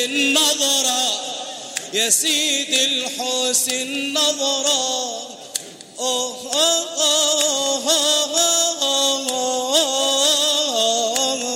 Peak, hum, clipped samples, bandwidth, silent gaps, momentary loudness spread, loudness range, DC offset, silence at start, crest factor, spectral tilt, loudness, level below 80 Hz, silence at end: -2 dBFS; none; under 0.1%; 16.5 kHz; none; 10 LU; 3 LU; under 0.1%; 0 s; 18 dB; 1 dB/octave; -17 LUFS; -74 dBFS; 0 s